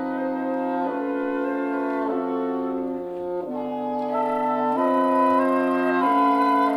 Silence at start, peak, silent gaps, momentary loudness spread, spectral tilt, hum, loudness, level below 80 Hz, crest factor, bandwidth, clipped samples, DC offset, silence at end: 0 s; -10 dBFS; none; 9 LU; -6.5 dB/octave; none; -23 LUFS; -64 dBFS; 14 dB; 12 kHz; under 0.1%; under 0.1%; 0 s